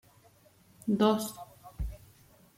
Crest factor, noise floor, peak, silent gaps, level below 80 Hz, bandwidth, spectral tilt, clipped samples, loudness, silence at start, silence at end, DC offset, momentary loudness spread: 22 dB; -62 dBFS; -12 dBFS; none; -48 dBFS; 16.5 kHz; -5.5 dB/octave; under 0.1%; -31 LUFS; 0.85 s; 0.6 s; under 0.1%; 23 LU